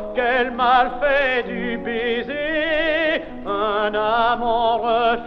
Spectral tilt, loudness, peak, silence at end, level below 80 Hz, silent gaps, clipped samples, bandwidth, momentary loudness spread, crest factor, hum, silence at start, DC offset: -6 dB/octave; -20 LUFS; -4 dBFS; 0 s; -42 dBFS; none; under 0.1%; 6.2 kHz; 7 LU; 16 dB; none; 0 s; under 0.1%